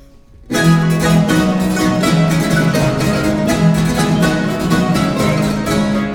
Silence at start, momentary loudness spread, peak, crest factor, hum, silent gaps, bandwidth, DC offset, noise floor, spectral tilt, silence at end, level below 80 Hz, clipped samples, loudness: 0.4 s; 3 LU; 0 dBFS; 14 dB; none; none; 17.5 kHz; under 0.1%; -40 dBFS; -6 dB/octave; 0 s; -32 dBFS; under 0.1%; -14 LUFS